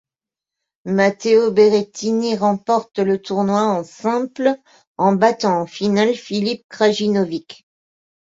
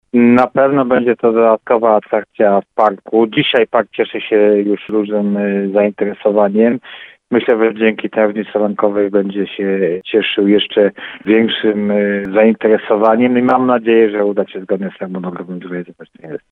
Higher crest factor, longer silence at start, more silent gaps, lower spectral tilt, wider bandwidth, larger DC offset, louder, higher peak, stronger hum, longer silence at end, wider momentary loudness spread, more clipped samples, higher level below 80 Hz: about the same, 16 dB vs 14 dB; first, 0.85 s vs 0.15 s; first, 4.87-4.95 s, 6.64-6.69 s vs none; second, -5.5 dB/octave vs -8.5 dB/octave; first, 7.8 kHz vs 4.4 kHz; neither; second, -18 LUFS vs -14 LUFS; about the same, -2 dBFS vs 0 dBFS; neither; first, 0.85 s vs 0.15 s; second, 7 LU vs 12 LU; neither; about the same, -62 dBFS vs -60 dBFS